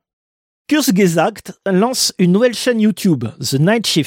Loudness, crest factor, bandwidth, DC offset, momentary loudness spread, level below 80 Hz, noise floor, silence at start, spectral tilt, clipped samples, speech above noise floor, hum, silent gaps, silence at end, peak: -15 LUFS; 14 dB; 17 kHz; under 0.1%; 6 LU; -58 dBFS; under -90 dBFS; 0.7 s; -5 dB/octave; under 0.1%; over 75 dB; none; none; 0 s; -2 dBFS